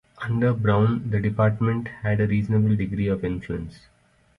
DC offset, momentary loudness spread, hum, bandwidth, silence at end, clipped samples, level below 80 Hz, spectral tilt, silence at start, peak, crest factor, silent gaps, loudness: under 0.1%; 9 LU; none; 4.8 kHz; 0.65 s; under 0.1%; -46 dBFS; -10 dB/octave; 0.2 s; -8 dBFS; 16 dB; none; -23 LUFS